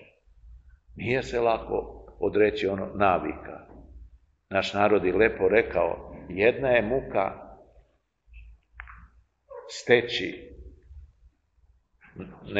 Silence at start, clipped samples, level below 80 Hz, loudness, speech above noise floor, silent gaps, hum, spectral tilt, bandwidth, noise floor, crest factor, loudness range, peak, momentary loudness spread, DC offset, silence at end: 0 s; under 0.1%; -50 dBFS; -25 LUFS; 40 dB; none; none; -5.5 dB/octave; 8 kHz; -65 dBFS; 24 dB; 6 LU; -4 dBFS; 22 LU; under 0.1%; 0 s